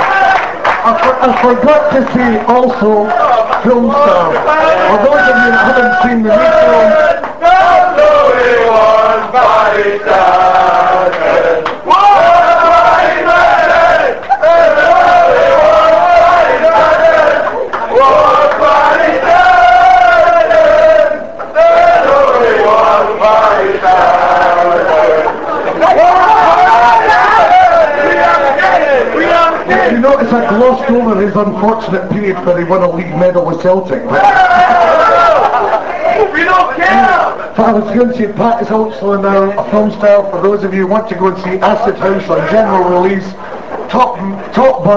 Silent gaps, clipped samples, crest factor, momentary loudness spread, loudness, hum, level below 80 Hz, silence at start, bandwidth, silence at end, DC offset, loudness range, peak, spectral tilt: none; 0.9%; 8 dB; 7 LU; -8 LUFS; none; -38 dBFS; 0 s; 8 kHz; 0 s; 3%; 4 LU; 0 dBFS; -5.5 dB/octave